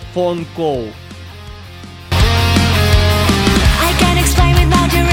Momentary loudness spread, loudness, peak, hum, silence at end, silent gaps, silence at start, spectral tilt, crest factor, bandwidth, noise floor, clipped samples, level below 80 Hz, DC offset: 21 LU; -13 LUFS; 0 dBFS; none; 0 s; none; 0 s; -5 dB/octave; 12 dB; 17 kHz; -32 dBFS; under 0.1%; -18 dBFS; under 0.1%